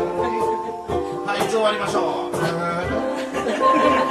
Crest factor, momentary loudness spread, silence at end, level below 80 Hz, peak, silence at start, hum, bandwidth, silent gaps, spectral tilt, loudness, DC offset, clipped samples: 16 dB; 8 LU; 0 s; -46 dBFS; -6 dBFS; 0 s; none; 14 kHz; none; -5 dB/octave; -21 LUFS; under 0.1%; under 0.1%